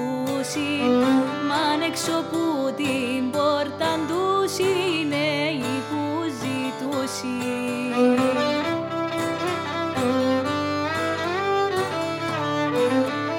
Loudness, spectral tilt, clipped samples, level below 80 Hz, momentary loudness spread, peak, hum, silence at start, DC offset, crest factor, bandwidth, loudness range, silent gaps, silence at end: -23 LUFS; -4.5 dB/octave; under 0.1%; -66 dBFS; 6 LU; -8 dBFS; none; 0 s; under 0.1%; 16 dB; 17.5 kHz; 1 LU; none; 0 s